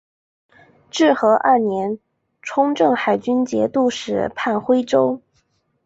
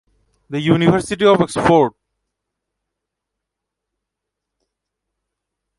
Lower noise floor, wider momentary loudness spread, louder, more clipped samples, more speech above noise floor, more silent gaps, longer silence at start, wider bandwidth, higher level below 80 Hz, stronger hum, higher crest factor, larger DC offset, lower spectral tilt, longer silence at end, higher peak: second, -65 dBFS vs -81 dBFS; first, 11 LU vs 8 LU; second, -18 LUFS vs -15 LUFS; neither; second, 47 dB vs 67 dB; neither; first, 0.95 s vs 0.5 s; second, 8 kHz vs 11.5 kHz; second, -60 dBFS vs -50 dBFS; neither; about the same, 16 dB vs 20 dB; neither; second, -5 dB/octave vs -6.5 dB/octave; second, 0.65 s vs 3.9 s; about the same, -2 dBFS vs 0 dBFS